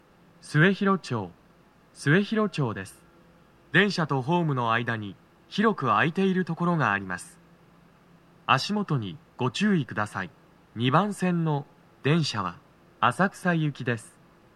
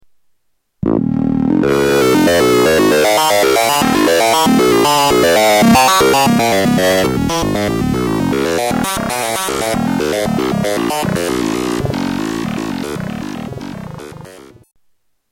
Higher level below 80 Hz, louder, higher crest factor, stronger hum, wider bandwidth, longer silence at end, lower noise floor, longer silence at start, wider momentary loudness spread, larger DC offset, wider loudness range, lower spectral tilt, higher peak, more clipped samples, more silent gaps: second, -68 dBFS vs -38 dBFS; second, -26 LUFS vs -13 LUFS; first, 22 dB vs 14 dB; neither; second, 12.5 kHz vs 17 kHz; second, 0.5 s vs 0.9 s; second, -58 dBFS vs -63 dBFS; second, 0.45 s vs 0.85 s; about the same, 13 LU vs 12 LU; neither; second, 3 LU vs 9 LU; first, -6 dB/octave vs -4.5 dB/octave; second, -4 dBFS vs 0 dBFS; neither; neither